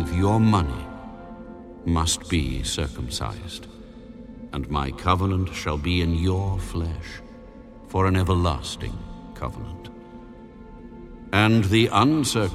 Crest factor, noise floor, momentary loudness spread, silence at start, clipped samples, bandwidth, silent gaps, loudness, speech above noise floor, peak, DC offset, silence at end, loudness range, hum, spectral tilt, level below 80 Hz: 20 dB; -43 dBFS; 24 LU; 0 s; under 0.1%; 14.5 kHz; none; -23 LUFS; 20 dB; -4 dBFS; under 0.1%; 0 s; 4 LU; none; -5.5 dB/octave; -36 dBFS